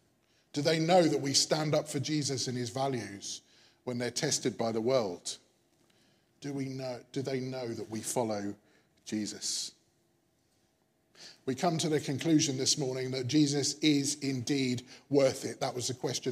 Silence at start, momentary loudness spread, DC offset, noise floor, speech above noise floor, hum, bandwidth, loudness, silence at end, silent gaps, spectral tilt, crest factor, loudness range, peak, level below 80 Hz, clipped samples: 0.55 s; 14 LU; under 0.1%; -73 dBFS; 41 dB; none; 15.5 kHz; -31 LUFS; 0 s; none; -4 dB/octave; 20 dB; 8 LU; -12 dBFS; -78 dBFS; under 0.1%